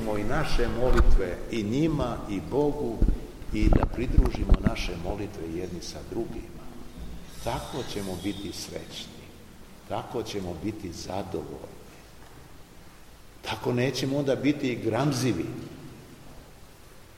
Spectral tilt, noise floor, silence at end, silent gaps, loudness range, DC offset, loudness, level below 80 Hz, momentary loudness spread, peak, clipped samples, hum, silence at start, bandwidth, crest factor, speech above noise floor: -6 dB/octave; -49 dBFS; 0 s; none; 9 LU; 0.2%; -29 LUFS; -32 dBFS; 22 LU; -6 dBFS; under 0.1%; none; 0 s; 15.5 kHz; 22 dB; 23 dB